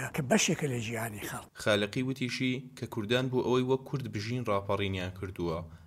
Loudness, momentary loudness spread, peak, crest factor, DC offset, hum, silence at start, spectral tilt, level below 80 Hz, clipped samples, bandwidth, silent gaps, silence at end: -32 LUFS; 9 LU; -12 dBFS; 20 dB; under 0.1%; none; 0 s; -4.5 dB/octave; -60 dBFS; under 0.1%; 16 kHz; none; 0 s